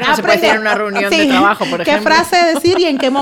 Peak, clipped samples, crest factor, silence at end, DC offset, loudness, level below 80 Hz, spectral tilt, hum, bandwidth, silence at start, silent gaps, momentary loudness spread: 0 dBFS; under 0.1%; 12 dB; 0 s; under 0.1%; -12 LUFS; -50 dBFS; -3.5 dB/octave; none; 17.5 kHz; 0 s; none; 4 LU